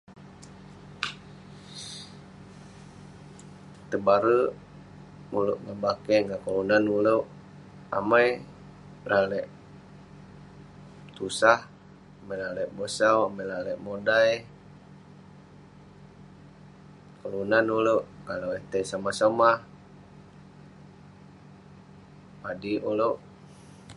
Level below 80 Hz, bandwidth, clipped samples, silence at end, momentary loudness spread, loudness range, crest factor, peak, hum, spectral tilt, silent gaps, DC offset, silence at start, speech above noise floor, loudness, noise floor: -62 dBFS; 11.5 kHz; under 0.1%; 0.05 s; 26 LU; 9 LU; 26 dB; -4 dBFS; 50 Hz at -65 dBFS; -5 dB/octave; none; under 0.1%; 0.1 s; 25 dB; -26 LUFS; -51 dBFS